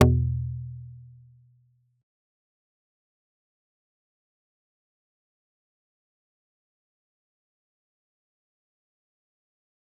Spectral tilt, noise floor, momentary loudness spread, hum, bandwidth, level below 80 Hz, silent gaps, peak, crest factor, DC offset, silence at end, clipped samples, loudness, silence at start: -7 dB/octave; -65 dBFS; 23 LU; none; 0.6 kHz; -48 dBFS; none; -2 dBFS; 32 dB; under 0.1%; 8.95 s; under 0.1%; -27 LUFS; 0 s